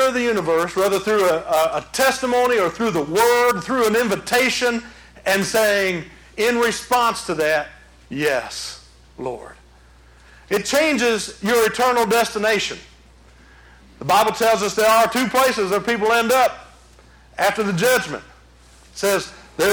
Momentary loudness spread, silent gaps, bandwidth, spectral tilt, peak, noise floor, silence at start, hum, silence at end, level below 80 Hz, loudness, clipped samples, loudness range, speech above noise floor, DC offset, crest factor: 14 LU; none; over 20 kHz; -3 dB/octave; -6 dBFS; -48 dBFS; 0 s; none; 0 s; -50 dBFS; -19 LUFS; under 0.1%; 5 LU; 30 dB; under 0.1%; 14 dB